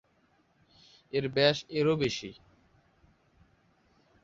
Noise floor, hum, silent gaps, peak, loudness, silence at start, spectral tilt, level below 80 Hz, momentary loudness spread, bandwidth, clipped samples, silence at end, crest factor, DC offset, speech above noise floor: -69 dBFS; none; none; -10 dBFS; -29 LUFS; 1.15 s; -5 dB/octave; -66 dBFS; 11 LU; 7.8 kHz; under 0.1%; 1.9 s; 24 dB; under 0.1%; 40 dB